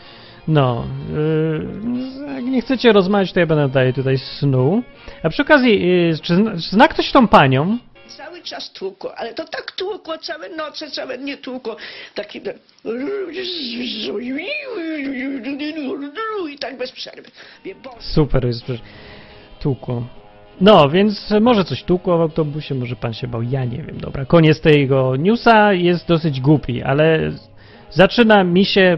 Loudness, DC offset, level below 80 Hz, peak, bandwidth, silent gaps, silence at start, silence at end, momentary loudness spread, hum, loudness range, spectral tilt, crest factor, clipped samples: -17 LUFS; under 0.1%; -40 dBFS; 0 dBFS; 6.4 kHz; none; 0.05 s; 0 s; 17 LU; none; 12 LU; -8 dB/octave; 18 dB; under 0.1%